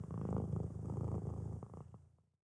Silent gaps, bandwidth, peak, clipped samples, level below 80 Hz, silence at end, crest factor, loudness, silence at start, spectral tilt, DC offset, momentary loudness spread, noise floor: none; 10 kHz; -26 dBFS; under 0.1%; -54 dBFS; 0.4 s; 16 dB; -43 LUFS; 0 s; -10.5 dB/octave; under 0.1%; 15 LU; -62 dBFS